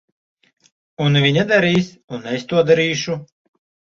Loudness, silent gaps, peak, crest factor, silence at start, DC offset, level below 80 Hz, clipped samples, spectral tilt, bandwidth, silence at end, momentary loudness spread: -17 LUFS; 2.04-2.08 s; -2 dBFS; 18 dB; 1 s; under 0.1%; -56 dBFS; under 0.1%; -5.5 dB/octave; 7.6 kHz; 0.65 s; 13 LU